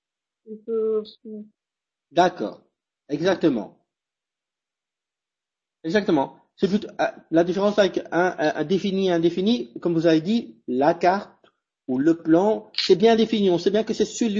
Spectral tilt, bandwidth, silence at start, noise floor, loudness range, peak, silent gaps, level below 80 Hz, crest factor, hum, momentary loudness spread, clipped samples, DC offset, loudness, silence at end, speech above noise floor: -6 dB/octave; 7.6 kHz; 0.5 s; -89 dBFS; 7 LU; -6 dBFS; none; -62 dBFS; 18 dB; none; 13 LU; under 0.1%; under 0.1%; -22 LUFS; 0 s; 67 dB